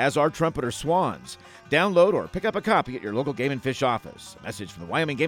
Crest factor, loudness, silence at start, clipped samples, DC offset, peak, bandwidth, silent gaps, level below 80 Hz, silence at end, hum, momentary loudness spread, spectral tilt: 18 dB; -24 LUFS; 0 s; under 0.1%; under 0.1%; -6 dBFS; 16.5 kHz; none; -52 dBFS; 0 s; none; 16 LU; -5.5 dB/octave